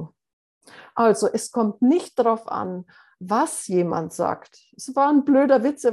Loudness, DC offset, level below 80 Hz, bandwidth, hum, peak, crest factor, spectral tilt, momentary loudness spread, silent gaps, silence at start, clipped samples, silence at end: -21 LUFS; under 0.1%; -70 dBFS; 12.5 kHz; none; -4 dBFS; 18 dB; -5.5 dB/octave; 15 LU; 0.33-0.61 s; 0 s; under 0.1%; 0 s